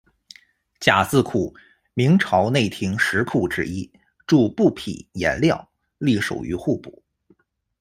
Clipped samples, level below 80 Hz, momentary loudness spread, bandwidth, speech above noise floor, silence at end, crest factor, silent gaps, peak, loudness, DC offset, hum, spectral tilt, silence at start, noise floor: under 0.1%; -52 dBFS; 13 LU; 15.5 kHz; 41 dB; 0.9 s; 22 dB; none; 0 dBFS; -21 LUFS; under 0.1%; none; -6 dB/octave; 0.8 s; -61 dBFS